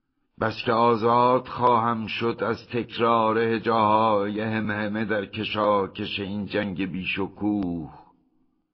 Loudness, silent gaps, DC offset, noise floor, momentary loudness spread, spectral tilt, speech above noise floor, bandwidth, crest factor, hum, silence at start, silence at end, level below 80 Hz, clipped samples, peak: -24 LUFS; none; under 0.1%; -67 dBFS; 9 LU; -8 dB/octave; 43 dB; 6.2 kHz; 16 dB; none; 0.4 s; 0.7 s; -58 dBFS; under 0.1%; -8 dBFS